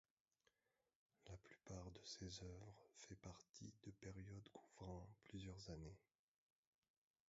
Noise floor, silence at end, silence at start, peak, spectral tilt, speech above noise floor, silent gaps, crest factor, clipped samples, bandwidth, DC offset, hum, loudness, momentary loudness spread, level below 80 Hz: under -90 dBFS; 1.3 s; 1.2 s; -42 dBFS; -5.5 dB/octave; over 31 dB; 3.49-3.54 s; 18 dB; under 0.1%; 7.6 kHz; under 0.1%; none; -59 LUFS; 8 LU; -72 dBFS